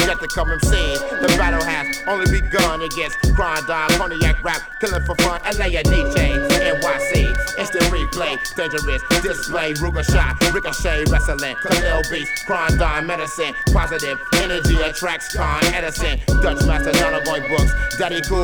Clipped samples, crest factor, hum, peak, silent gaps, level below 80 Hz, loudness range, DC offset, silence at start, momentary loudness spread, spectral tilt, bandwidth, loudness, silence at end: under 0.1%; 16 dB; none; -2 dBFS; none; -22 dBFS; 1 LU; under 0.1%; 0 s; 5 LU; -4 dB/octave; over 20 kHz; -19 LUFS; 0 s